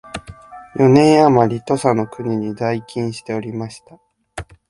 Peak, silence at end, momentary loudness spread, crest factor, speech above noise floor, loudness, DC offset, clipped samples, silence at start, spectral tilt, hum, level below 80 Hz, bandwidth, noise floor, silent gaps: 0 dBFS; 0.25 s; 22 LU; 18 dB; 22 dB; -16 LUFS; under 0.1%; under 0.1%; 0.05 s; -7 dB/octave; none; -48 dBFS; 11.5 kHz; -38 dBFS; none